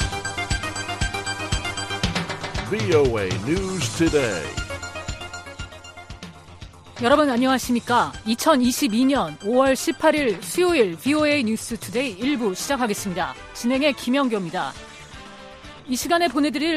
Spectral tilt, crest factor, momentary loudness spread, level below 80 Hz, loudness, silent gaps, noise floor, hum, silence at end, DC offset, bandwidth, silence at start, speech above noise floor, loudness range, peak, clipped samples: -4.5 dB/octave; 18 dB; 20 LU; -40 dBFS; -22 LUFS; none; -42 dBFS; none; 0 s; under 0.1%; 15 kHz; 0 s; 21 dB; 6 LU; -4 dBFS; under 0.1%